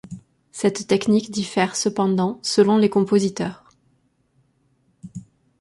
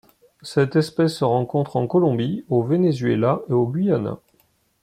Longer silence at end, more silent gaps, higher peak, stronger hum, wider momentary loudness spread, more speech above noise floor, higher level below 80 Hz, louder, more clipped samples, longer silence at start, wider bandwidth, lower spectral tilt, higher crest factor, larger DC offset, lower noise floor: second, 0.4 s vs 0.65 s; neither; about the same, -4 dBFS vs -6 dBFS; neither; first, 22 LU vs 5 LU; about the same, 45 dB vs 43 dB; about the same, -62 dBFS vs -60 dBFS; about the same, -20 LUFS vs -21 LUFS; neither; second, 0.1 s vs 0.45 s; second, 11.5 kHz vs 13.5 kHz; second, -5 dB/octave vs -8 dB/octave; about the same, 18 dB vs 16 dB; neither; about the same, -64 dBFS vs -63 dBFS